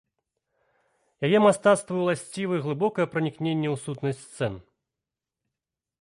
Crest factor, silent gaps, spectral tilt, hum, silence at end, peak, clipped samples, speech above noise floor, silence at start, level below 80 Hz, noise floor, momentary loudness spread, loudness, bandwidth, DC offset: 20 dB; none; -6 dB/octave; none; 1.4 s; -8 dBFS; under 0.1%; 64 dB; 1.2 s; -64 dBFS; -88 dBFS; 12 LU; -25 LUFS; 11.5 kHz; under 0.1%